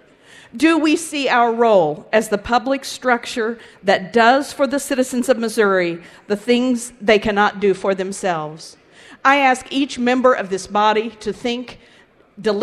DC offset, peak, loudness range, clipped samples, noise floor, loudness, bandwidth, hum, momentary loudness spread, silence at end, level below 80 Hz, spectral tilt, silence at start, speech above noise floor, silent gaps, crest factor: under 0.1%; 0 dBFS; 1 LU; under 0.1%; -46 dBFS; -18 LUFS; 14.5 kHz; none; 10 LU; 0 s; -52 dBFS; -4 dB/octave; 0.55 s; 29 dB; none; 18 dB